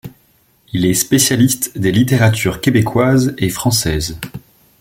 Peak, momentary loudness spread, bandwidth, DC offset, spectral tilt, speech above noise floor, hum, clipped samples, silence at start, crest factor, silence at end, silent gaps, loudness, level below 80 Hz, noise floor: 0 dBFS; 9 LU; 17 kHz; under 0.1%; -4.5 dB/octave; 41 dB; none; under 0.1%; 0.05 s; 16 dB; 0.4 s; none; -14 LUFS; -38 dBFS; -55 dBFS